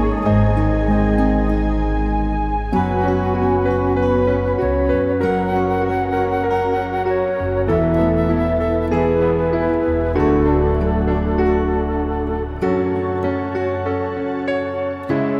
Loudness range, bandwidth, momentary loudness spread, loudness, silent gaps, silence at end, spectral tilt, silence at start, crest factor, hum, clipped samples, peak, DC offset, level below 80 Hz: 3 LU; 6.8 kHz; 5 LU; -19 LUFS; none; 0 s; -9.5 dB/octave; 0 s; 14 dB; none; under 0.1%; -4 dBFS; under 0.1%; -26 dBFS